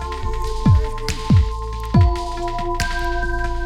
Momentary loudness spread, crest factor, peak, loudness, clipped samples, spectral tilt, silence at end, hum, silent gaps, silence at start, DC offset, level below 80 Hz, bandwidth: 9 LU; 16 dB; -2 dBFS; -20 LUFS; under 0.1%; -6.5 dB/octave; 0 s; none; none; 0 s; under 0.1%; -22 dBFS; 13.5 kHz